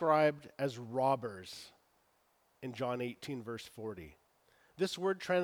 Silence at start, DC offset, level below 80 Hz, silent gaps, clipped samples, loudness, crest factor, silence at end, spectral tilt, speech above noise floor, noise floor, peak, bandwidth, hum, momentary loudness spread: 0 s; under 0.1%; -74 dBFS; none; under 0.1%; -37 LUFS; 20 dB; 0 s; -5.5 dB/octave; 38 dB; -74 dBFS; -16 dBFS; 20 kHz; none; 16 LU